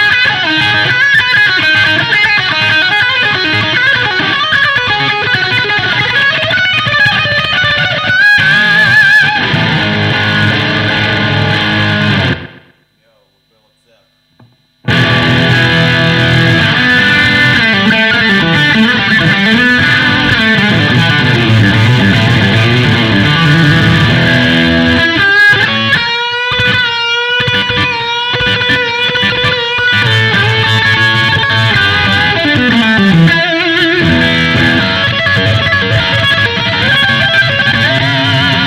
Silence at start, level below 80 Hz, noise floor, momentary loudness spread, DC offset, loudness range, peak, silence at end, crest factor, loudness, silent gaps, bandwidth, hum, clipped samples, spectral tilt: 0 s; -36 dBFS; -55 dBFS; 4 LU; under 0.1%; 4 LU; 0 dBFS; 0 s; 10 dB; -8 LUFS; none; 15 kHz; none; under 0.1%; -5 dB/octave